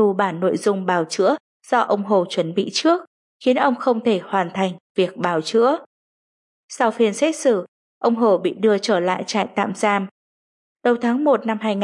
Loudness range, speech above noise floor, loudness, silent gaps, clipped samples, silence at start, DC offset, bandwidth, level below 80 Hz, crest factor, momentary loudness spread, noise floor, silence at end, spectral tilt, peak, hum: 2 LU; over 71 dB; -20 LUFS; 1.40-1.60 s, 3.07-3.40 s, 4.80-4.95 s, 5.86-6.68 s, 7.68-8.01 s, 10.11-10.76 s; under 0.1%; 0 s; under 0.1%; 11.5 kHz; -76 dBFS; 16 dB; 5 LU; under -90 dBFS; 0 s; -5 dB/octave; -4 dBFS; none